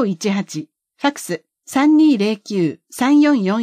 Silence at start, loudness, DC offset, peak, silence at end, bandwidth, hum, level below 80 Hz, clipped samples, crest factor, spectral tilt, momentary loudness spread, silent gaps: 0 s; -17 LUFS; under 0.1%; -4 dBFS; 0 s; 14.5 kHz; none; -70 dBFS; under 0.1%; 12 dB; -5.5 dB/octave; 15 LU; none